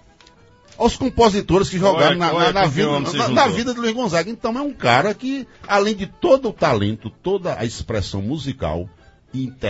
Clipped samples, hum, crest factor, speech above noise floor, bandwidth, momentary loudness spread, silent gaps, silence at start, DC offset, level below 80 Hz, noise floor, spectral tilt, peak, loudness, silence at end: under 0.1%; none; 18 dB; 31 dB; 8 kHz; 10 LU; none; 0.8 s; under 0.1%; -42 dBFS; -50 dBFS; -5 dB/octave; 0 dBFS; -19 LUFS; 0 s